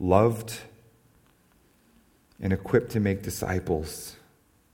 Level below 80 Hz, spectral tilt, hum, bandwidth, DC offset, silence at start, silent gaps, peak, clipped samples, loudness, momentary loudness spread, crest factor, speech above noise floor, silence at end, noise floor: -50 dBFS; -6.5 dB/octave; none; 19 kHz; under 0.1%; 0 s; none; -4 dBFS; under 0.1%; -27 LUFS; 16 LU; 24 dB; 37 dB; 0.6 s; -63 dBFS